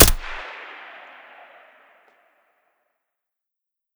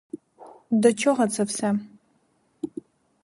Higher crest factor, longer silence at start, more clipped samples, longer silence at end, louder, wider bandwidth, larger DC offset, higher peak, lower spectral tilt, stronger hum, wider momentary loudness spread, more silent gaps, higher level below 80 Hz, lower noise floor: about the same, 26 dB vs 22 dB; second, 0 s vs 0.15 s; neither; first, 3.3 s vs 0.55 s; about the same, -23 LUFS vs -23 LUFS; first, over 20 kHz vs 11.5 kHz; neither; first, 0 dBFS vs -4 dBFS; second, -3 dB/octave vs -5 dB/octave; neither; about the same, 20 LU vs 22 LU; neither; first, -32 dBFS vs -72 dBFS; first, -85 dBFS vs -67 dBFS